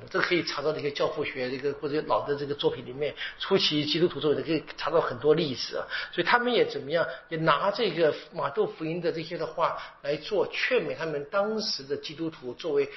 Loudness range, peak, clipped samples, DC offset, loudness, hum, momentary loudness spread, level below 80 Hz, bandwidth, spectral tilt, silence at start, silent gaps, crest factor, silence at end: 3 LU; -6 dBFS; under 0.1%; under 0.1%; -28 LUFS; none; 8 LU; -60 dBFS; 6 kHz; -2.5 dB/octave; 0 s; none; 22 dB; 0 s